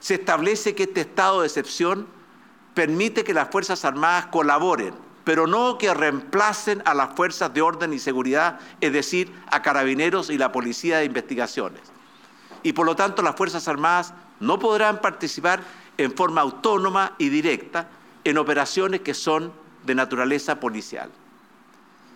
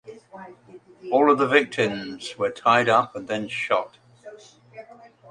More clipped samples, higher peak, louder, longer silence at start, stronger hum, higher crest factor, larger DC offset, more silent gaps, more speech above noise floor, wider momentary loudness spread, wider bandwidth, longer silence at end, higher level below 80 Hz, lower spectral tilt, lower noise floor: neither; about the same, -2 dBFS vs -2 dBFS; about the same, -22 LUFS vs -22 LUFS; about the same, 0 s vs 0.05 s; neither; about the same, 20 dB vs 22 dB; neither; neither; first, 31 dB vs 27 dB; second, 8 LU vs 24 LU; first, 17 kHz vs 11 kHz; first, 1.05 s vs 0.5 s; second, -80 dBFS vs -68 dBFS; about the same, -4 dB/octave vs -5 dB/octave; first, -53 dBFS vs -49 dBFS